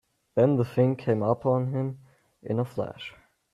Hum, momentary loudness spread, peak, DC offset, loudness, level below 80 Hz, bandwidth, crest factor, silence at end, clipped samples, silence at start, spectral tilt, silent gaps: none; 18 LU; -10 dBFS; under 0.1%; -27 LUFS; -66 dBFS; 11 kHz; 18 dB; 0.45 s; under 0.1%; 0.35 s; -9.5 dB/octave; none